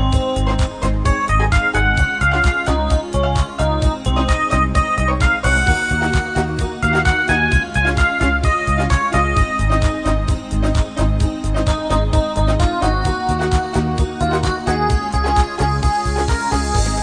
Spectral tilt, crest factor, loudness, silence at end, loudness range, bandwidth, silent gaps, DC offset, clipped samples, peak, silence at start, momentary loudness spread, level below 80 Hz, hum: -5.5 dB/octave; 14 dB; -17 LUFS; 0 s; 2 LU; 10 kHz; none; 0.2%; under 0.1%; -2 dBFS; 0 s; 4 LU; -20 dBFS; none